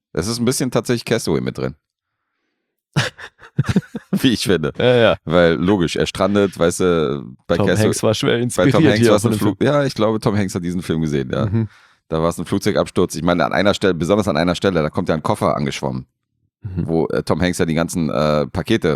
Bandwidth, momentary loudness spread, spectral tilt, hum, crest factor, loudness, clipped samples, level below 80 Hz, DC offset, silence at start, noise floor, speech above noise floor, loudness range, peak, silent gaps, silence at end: 15.5 kHz; 9 LU; -5.5 dB/octave; none; 16 dB; -18 LUFS; under 0.1%; -46 dBFS; under 0.1%; 0.15 s; -76 dBFS; 59 dB; 6 LU; -2 dBFS; none; 0 s